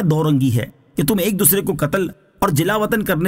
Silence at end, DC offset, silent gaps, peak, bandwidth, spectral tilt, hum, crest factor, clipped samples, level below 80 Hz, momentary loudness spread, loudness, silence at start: 0 s; under 0.1%; none; 0 dBFS; 16.5 kHz; -5 dB/octave; none; 18 dB; under 0.1%; -44 dBFS; 8 LU; -18 LUFS; 0 s